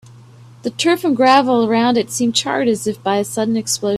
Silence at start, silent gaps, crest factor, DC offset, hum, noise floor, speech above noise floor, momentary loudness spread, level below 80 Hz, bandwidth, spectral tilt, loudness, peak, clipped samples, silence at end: 0.4 s; none; 16 dB; under 0.1%; none; -42 dBFS; 26 dB; 7 LU; -60 dBFS; 14.5 kHz; -3.5 dB/octave; -16 LUFS; 0 dBFS; under 0.1%; 0 s